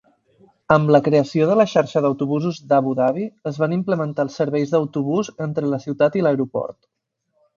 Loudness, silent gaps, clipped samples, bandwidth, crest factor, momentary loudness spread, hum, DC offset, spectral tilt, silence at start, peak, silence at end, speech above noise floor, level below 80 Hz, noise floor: -20 LUFS; none; under 0.1%; 7.4 kHz; 20 dB; 9 LU; none; under 0.1%; -7.5 dB/octave; 0.7 s; 0 dBFS; 0.85 s; 50 dB; -60 dBFS; -69 dBFS